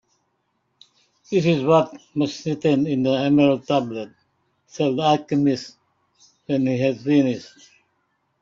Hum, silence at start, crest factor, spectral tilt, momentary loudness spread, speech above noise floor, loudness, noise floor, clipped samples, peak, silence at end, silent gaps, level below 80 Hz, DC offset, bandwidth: none; 1.3 s; 18 dB; -7 dB/octave; 12 LU; 51 dB; -21 LUFS; -71 dBFS; under 0.1%; -4 dBFS; 0.95 s; none; -62 dBFS; under 0.1%; 7.6 kHz